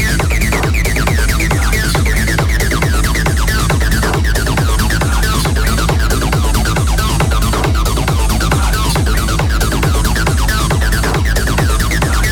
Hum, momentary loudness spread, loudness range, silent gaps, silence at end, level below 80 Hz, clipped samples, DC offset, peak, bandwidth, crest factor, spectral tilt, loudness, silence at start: none; 1 LU; 0 LU; none; 0 s; -16 dBFS; under 0.1%; under 0.1%; 0 dBFS; 19 kHz; 12 dB; -4.5 dB/octave; -14 LUFS; 0 s